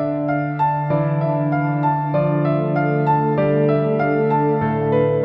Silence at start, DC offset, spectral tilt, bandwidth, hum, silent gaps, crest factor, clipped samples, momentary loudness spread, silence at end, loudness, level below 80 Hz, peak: 0 s; under 0.1%; -11.5 dB/octave; 5 kHz; none; none; 12 dB; under 0.1%; 2 LU; 0 s; -19 LUFS; -52 dBFS; -6 dBFS